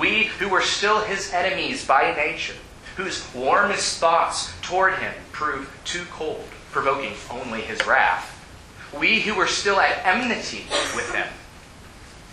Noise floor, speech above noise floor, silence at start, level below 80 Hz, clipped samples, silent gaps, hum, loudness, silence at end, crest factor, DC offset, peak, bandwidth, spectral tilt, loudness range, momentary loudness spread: -44 dBFS; 21 dB; 0 s; -50 dBFS; under 0.1%; none; none; -22 LUFS; 0 s; 20 dB; under 0.1%; -4 dBFS; 12.5 kHz; -2 dB/octave; 4 LU; 12 LU